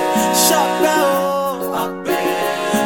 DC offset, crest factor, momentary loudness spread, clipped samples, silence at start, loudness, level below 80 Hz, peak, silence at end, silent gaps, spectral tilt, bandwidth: under 0.1%; 16 dB; 8 LU; under 0.1%; 0 s; -16 LUFS; -54 dBFS; -2 dBFS; 0 s; none; -3 dB/octave; over 20 kHz